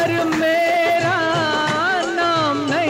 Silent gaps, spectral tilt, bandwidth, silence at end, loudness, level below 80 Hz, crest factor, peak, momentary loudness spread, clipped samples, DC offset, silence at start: none; -4.5 dB/octave; 16 kHz; 0 s; -18 LUFS; -54 dBFS; 12 dB; -6 dBFS; 2 LU; under 0.1%; under 0.1%; 0 s